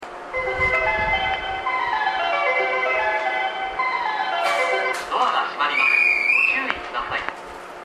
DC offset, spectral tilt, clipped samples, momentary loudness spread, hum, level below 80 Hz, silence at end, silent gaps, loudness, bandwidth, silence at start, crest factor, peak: under 0.1%; -3 dB/octave; under 0.1%; 10 LU; none; -46 dBFS; 0 s; none; -20 LUFS; 13.5 kHz; 0 s; 20 dB; -2 dBFS